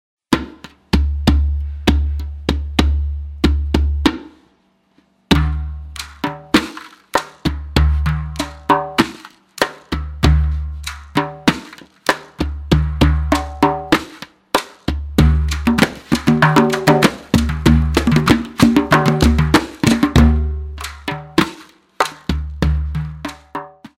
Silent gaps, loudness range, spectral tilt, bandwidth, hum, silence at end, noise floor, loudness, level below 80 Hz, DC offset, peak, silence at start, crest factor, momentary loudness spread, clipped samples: none; 6 LU; -6 dB/octave; 16 kHz; none; 0.1 s; -59 dBFS; -17 LUFS; -22 dBFS; under 0.1%; 0 dBFS; 0.3 s; 16 dB; 13 LU; under 0.1%